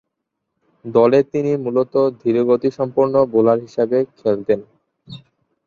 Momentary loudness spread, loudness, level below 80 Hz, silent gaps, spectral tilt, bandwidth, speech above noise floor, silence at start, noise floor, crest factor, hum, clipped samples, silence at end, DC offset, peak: 6 LU; -17 LUFS; -60 dBFS; none; -8.5 dB/octave; 7 kHz; 61 dB; 0.85 s; -77 dBFS; 16 dB; none; under 0.1%; 0.5 s; under 0.1%; -2 dBFS